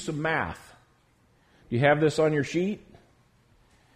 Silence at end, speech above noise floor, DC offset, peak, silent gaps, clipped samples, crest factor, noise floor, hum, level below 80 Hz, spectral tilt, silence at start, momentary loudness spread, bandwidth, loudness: 1.2 s; 38 dB; under 0.1%; -8 dBFS; none; under 0.1%; 20 dB; -64 dBFS; none; -58 dBFS; -6 dB/octave; 0 s; 14 LU; 12.5 kHz; -26 LUFS